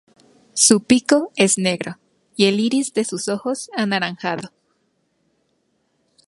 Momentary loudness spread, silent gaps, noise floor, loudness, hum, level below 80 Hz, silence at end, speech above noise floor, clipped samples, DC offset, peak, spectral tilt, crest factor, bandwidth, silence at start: 15 LU; none; -67 dBFS; -18 LUFS; none; -66 dBFS; 1.85 s; 49 dB; under 0.1%; under 0.1%; 0 dBFS; -3 dB/octave; 20 dB; 11.5 kHz; 0.55 s